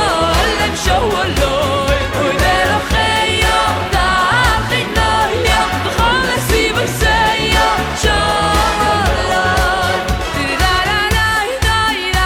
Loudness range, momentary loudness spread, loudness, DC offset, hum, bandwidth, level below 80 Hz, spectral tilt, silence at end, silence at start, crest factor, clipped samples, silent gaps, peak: 1 LU; 3 LU; -14 LUFS; under 0.1%; none; 17.5 kHz; -24 dBFS; -3.5 dB/octave; 0 s; 0 s; 12 dB; under 0.1%; none; -2 dBFS